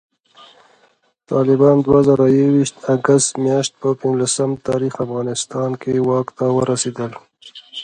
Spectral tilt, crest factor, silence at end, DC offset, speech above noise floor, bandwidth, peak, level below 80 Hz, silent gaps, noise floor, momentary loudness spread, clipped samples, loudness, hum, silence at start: -5.5 dB/octave; 16 dB; 0 s; under 0.1%; 42 dB; 11 kHz; 0 dBFS; -52 dBFS; none; -58 dBFS; 9 LU; under 0.1%; -17 LUFS; none; 1.3 s